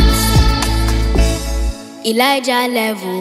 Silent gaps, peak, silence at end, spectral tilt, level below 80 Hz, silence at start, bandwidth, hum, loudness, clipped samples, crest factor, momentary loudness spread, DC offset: none; 0 dBFS; 0 s; -4.5 dB/octave; -18 dBFS; 0 s; 16 kHz; none; -15 LUFS; under 0.1%; 14 dB; 9 LU; under 0.1%